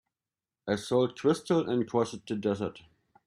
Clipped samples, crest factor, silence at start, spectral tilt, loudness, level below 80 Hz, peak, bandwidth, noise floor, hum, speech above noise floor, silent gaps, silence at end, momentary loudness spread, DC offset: under 0.1%; 18 dB; 0.65 s; -6 dB/octave; -30 LUFS; -68 dBFS; -12 dBFS; 14 kHz; under -90 dBFS; none; over 61 dB; none; 0.5 s; 8 LU; under 0.1%